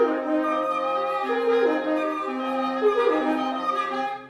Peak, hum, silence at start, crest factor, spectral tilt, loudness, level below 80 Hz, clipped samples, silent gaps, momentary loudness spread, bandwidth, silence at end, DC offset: -10 dBFS; none; 0 s; 14 dB; -4.5 dB/octave; -24 LUFS; -68 dBFS; under 0.1%; none; 5 LU; 12.5 kHz; 0 s; under 0.1%